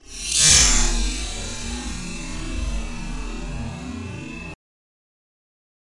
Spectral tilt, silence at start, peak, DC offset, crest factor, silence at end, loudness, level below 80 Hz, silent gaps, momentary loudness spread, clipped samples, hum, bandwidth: -1.5 dB/octave; 0.05 s; 0 dBFS; under 0.1%; 24 dB; 1.45 s; -19 LUFS; -30 dBFS; none; 20 LU; under 0.1%; none; 11.5 kHz